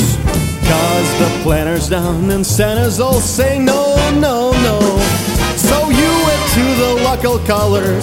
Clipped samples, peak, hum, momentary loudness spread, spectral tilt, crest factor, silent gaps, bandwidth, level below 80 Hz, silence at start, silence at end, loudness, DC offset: under 0.1%; 0 dBFS; none; 3 LU; -4.5 dB/octave; 12 dB; none; 17 kHz; -24 dBFS; 0 s; 0 s; -13 LUFS; under 0.1%